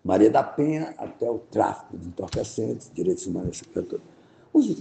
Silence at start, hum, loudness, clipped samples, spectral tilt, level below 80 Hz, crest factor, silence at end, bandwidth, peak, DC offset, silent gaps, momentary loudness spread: 0.05 s; none; -26 LUFS; under 0.1%; -6.5 dB/octave; -54 dBFS; 20 dB; 0 s; 9 kHz; -6 dBFS; under 0.1%; none; 15 LU